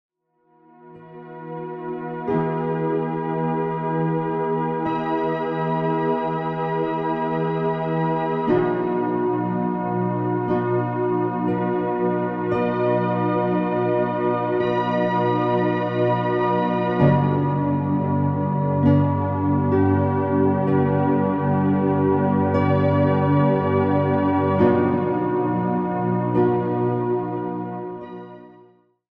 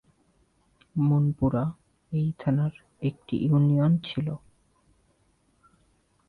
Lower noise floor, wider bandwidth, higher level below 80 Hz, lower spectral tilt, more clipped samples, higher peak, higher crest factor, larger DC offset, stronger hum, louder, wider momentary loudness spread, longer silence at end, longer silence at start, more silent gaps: second, -62 dBFS vs -67 dBFS; first, 5.2 kHz vs 4.4 kHz; about the same, -56 dBFS vs -52 dBFS; about the same, -10.5 dB/octave vs -10 dB/octave; neither; first, -6 dBFS vs -14 dBFS; about the same, 16 dB vs 14 dB; neither; neither; first, -21 LUFS vs -26 LUFS; second, 6 LU vs 11 LU; second, 0.65 s vs 1.9 s; about the same, 0.85 s vs 0.95 s; neither